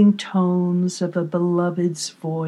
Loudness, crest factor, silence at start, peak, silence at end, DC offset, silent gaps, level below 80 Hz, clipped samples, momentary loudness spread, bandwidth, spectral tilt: -21 LUFS; 14 dB; 0 s; -6 dBFS; 0 s; under 0.1%; none; -82 dBFS; under 0.1%; 5 LU; 12 kHz; -6.5 dB/octave